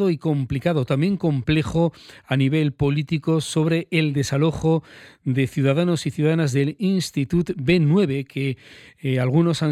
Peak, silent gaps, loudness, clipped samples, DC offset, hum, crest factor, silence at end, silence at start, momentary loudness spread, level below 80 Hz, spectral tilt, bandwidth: -6 dBFS; none; -21 LUFS; under 0.1%; under 0.1%; none; 14 dB; 0 s; 0 s; 6 LU; -46 dBFS; -7 dB/octave; 14 kHz